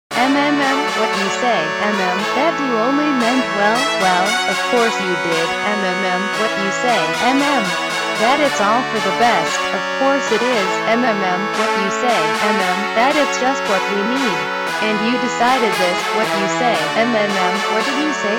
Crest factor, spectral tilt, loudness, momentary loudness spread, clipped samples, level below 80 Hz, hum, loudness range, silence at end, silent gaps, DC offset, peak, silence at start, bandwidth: 16 dB; -3.5 dB/octave; -16 LUFS; 3 LU; under 0.1%; -58 dBFS; none; 1 LU; 0 s; none; under 0.1%; 0 dBFS; 0.1 s; 19.5 kHz